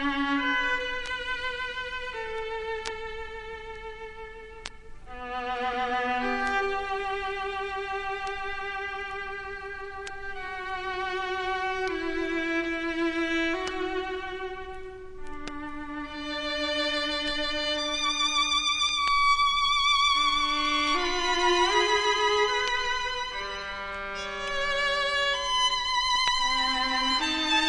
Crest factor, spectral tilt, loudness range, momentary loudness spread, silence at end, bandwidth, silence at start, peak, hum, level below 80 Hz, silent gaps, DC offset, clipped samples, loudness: 22 dB; -1.5 dB/octave; 11 LU; 15 LU; 0 s; 11 kHz; 0 s; -8 dBFS; none; -48 dBFS; none; under 0.1%; under 0.1%; -27 LUFS